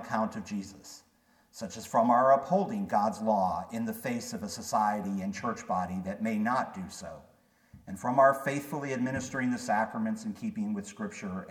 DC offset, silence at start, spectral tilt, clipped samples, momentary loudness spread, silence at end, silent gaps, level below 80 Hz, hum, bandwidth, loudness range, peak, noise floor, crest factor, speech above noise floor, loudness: under 0.1%; 0 s; -5.5 dB/octave; under 0.1%; 17 LU; 0 s; none; -66 dBFS; none; 18 kHz; 4 LU; -10 dBFS; -59 dBFS; 20 dB; 28 dB; -30 LUFS